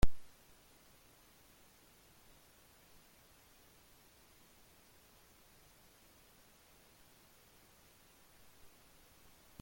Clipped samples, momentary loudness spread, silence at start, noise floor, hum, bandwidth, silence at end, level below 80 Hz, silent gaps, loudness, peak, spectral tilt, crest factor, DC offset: under 0.1%; 0 LU; 0.05 s; -65 dBFS; none; 17 kHz; 9.4 s; -50 dBFS; none; -59 LUFS; -16 dBFS; -5 dB/octave; 26 dB; under 0.1%